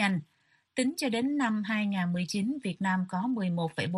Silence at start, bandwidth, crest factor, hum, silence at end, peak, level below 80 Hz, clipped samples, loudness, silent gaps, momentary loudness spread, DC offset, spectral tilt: 0 s; 13 kHz; 16 dB; none; 0 s; -14 dBFS; -72 dBFS; under 0.1%; -30 LUFS; none; 3 LU; under 0.1%; -5.5 dB/octave